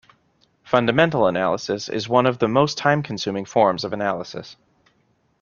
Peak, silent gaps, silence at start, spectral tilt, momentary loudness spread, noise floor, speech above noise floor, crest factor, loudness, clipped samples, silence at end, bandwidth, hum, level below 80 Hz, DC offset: -2 dBFS; none; 0.65 s; -5.5 dB/octave; 8 LU; -64 dBFS; 44 dB; 20 dB; -20 LUFS; under 0.1%; 0.9 s; 7.2 kHz; none; -58 dBFS; under 0.1%